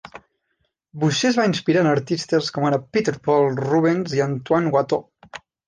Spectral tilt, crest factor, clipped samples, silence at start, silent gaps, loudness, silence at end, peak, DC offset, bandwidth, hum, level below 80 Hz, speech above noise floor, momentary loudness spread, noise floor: -5.5 dB/octave; 16 dB; under 0.1%; 0.05 s; none; -20 LUFS; 0.3 s; -6 dBFS; under 0.1%; 10 kHz; none; -60 dBFS; 52 dB; 6 LU; -72 dBFS